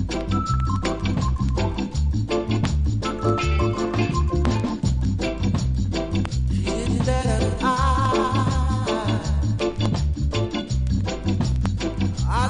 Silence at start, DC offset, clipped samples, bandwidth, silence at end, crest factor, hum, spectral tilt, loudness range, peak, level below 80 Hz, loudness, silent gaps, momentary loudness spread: 0 s; under 0.1%; under 0.1%; 10.5 kHz; 0 s; 16 dB; none; -6.5 dB/octave; 2 LU; -6 dBFS; -26 dBFS; -23 LUFS; none; 4 LU